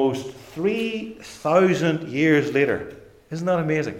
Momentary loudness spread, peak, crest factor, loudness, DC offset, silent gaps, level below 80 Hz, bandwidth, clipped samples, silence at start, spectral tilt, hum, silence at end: 16 LU; -6 dBFS; 16 dB; -22 LUFS; under 0.1%; none; -58 dBFS; 15.5 kHz; under 0.1%; 0 s; -6.5 dB/octave; none; 0 s